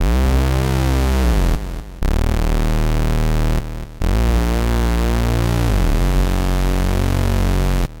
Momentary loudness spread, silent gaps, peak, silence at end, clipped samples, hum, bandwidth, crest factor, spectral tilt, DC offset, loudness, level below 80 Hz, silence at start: 4 LU; none; -8 dBFS; 0 s; under 0.1%; none; 17 kHz; 8 dB; -6 dB/octave; under 0.1%; -19 LUFS; -18 dBFS; 0 s